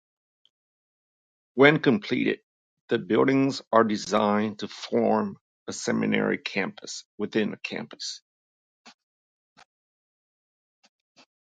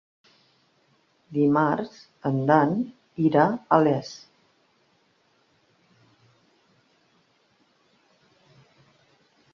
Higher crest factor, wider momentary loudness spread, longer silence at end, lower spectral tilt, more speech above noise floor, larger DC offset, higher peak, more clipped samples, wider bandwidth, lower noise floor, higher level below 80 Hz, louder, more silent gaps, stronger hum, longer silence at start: about the same, 26 dB vs 24 dB; about the same, 15 LU vs 14 LU; second, 2.6 s vs 5.35 s; second, -5 dB/octave vs -8 dB/octave; first, over 65 dB vs 44 dB; neither; about the same, -2 dBFS vs -4 dBFS; neither; first, 9.2 kHz vs 7 kHz; first, under -90 dBFS vs -66 dBFS; about the same, -72 dBFS vs -70 dBFS; about the same, -25 LUFS vs -23 LUFS; first, 2.43-2.88 s, 3.67-3.71 s, 5.41-5.66 s, 7.05-7.18 s, 8.22-8.85 s vs none; neither; first, 1.55 s vs 1.3 s